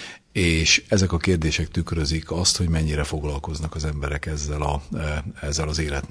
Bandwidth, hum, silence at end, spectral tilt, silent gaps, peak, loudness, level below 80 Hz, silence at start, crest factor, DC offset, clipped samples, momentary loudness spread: 11 kHz; none; 0.05 s; -4 dB/octave; none; -4 dBFS; -23 LUFS; -32 dBFS; 0 s; 20 dB; under 0.1%; under 0.1%; 11 LU